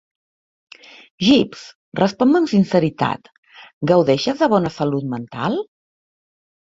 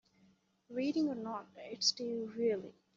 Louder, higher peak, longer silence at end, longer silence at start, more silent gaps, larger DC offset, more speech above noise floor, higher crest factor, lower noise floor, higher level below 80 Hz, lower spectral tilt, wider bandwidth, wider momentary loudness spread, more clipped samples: first, -18 LUFS vs -36 LUFS; first, 0 dBFS vs -18 dBFS; first, 1 s vs 0.25 s; first, 1.2 s vs 0.7 s; first, 1.75-1.92 s, 3.38-3.43 s, 3.73-3.81 s vs none; neither; first, over 73 dB vs 34 dB; about the same, 18 dB vs 20 dB; first, under -90 dBFS vs -70 dBFS; first, -56 dBFS vs -82 dBFS; first, -6.5 dB/octave vs -3 dB/octave; about the same, 7.8 kHz vs 7.6 kHz; about the same, 12 LU vs 12 LU; neither